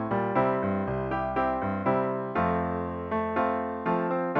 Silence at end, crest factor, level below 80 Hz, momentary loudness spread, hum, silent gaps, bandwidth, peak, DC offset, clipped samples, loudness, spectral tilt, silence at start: 0 s; 16 dB; -50 dBFS; 4 LU; none; none; 5.8 kHz; -12 dBFS; under 0.1%; under 0.1%; -28 LUFS; -10 dB/octave; 0 s